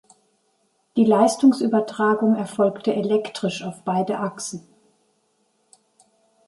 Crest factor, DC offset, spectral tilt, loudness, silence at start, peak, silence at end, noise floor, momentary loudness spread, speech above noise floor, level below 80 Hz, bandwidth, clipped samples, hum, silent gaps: 18 dB; under 0.1%; -5.5 dB/octave; -21 LUFS; 0.95 s; -4 dBFS; 1.85 s; -67 dBFS; 12 LU; 47 dB; -72 dBFS; 11.5 kHz; under 0.1%; none; none